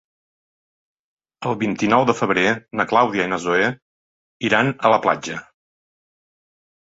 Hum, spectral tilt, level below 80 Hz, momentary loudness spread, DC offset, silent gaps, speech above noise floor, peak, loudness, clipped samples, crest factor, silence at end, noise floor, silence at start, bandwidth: none; -5 dB/octave; -60 dBFS; 10 LU; under 0.1%; 3.82-4.40 s; over 71 dB; -2 dBFS; -19 LUFS; under 0.1%; 20 dB; 1.5 s; under -90 dBFS; 1.4 s; 8 kHz